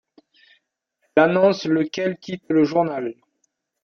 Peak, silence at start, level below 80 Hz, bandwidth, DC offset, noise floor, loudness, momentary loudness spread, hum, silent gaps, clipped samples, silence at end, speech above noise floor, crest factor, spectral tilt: -2 dBFS; 1.15 s; -66 dBFS; 6.8 kHz; under 0.1%; -72 dBFS; -20 LUFS; 12 LU; none; none; under 0.1%; 0.7 s; 53 dB; 20 dB; -6.5 dB/octave